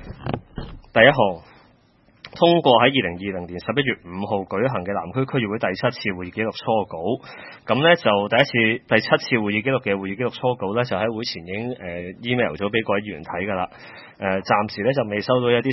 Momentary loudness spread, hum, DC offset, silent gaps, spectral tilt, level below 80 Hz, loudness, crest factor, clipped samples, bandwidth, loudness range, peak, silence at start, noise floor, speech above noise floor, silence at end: 14 LU; none; under 0.1%; none; -7 dB/octave; -52 dBFS; -21 LUFS; 22 dB; under 0.1%; 6 kHz; 5 LU; 0 dBFS; 0 s; -57 dBFS; 36 dB; 0 s